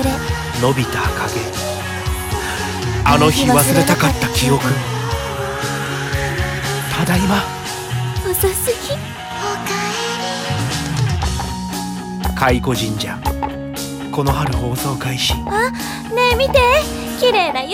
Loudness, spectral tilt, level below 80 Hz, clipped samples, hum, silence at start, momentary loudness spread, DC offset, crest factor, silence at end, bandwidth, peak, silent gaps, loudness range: -18 LUFS; -4.5 dB/octave; -30 dBFS; under 0.1%; none; 0 s; 10 LU; under 0.1%; 18 dB; 0 s; 17.5 kHz; 0 dBFS; none; 5 LU